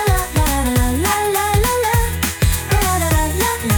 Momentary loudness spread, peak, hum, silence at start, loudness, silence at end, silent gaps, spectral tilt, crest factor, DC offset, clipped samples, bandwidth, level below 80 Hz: 2 LU; -4 dBFS; none; 0 s; -17 LUFS; 0 s; none; -4.5 dB/octave; 12 dB; under 0.1%; under 0.1%; 19.5 kHz; -22 dBFS